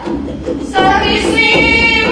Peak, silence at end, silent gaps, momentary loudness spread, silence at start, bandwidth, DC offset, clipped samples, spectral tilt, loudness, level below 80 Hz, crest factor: 0 dBFS; 0 s; none; 13 LU; 0 s; 10.5 kHz; under 0.1%; under 0.1%; -4 dB/octave; -10 LUFS; -28 dBFS; 12 dB